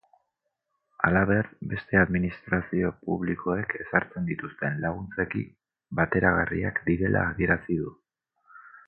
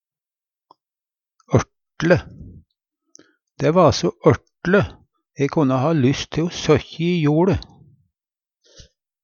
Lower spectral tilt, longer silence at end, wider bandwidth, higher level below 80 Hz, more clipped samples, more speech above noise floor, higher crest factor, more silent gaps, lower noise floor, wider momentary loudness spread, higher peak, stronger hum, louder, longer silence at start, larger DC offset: first, -11.5 dB/octave vs -6.5 dB/octave; second, 0.2 s vs 1.6 s; second, 4.7 kHz vs 7.2 kHz; about the same, -46 dBFS vs -44 dBFS; neither; second, 54 dB vs over 72 dB; about the same, 22 dB vs 20 dB; neither; second, -81 dBFS vs under -90 dBFS; about the same, 9 LU vs 9 LU; about the same, -4 dBFS vs -2 dBFS; neither; second, -27 LUFS vs -19 LUFS; second, 1 s vs 1.5 s; neither